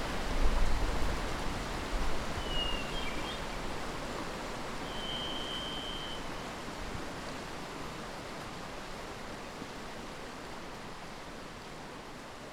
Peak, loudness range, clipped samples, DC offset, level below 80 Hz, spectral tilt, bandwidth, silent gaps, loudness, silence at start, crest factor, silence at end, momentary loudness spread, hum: -16 dBFS; 8 LU; under 0.1%; under 0.1%; -40 dBFS; -4 dB/octave; 15.5 kHz; none; -39 LUFS; 0 s; 20 dB; 0 s; 10 LU; none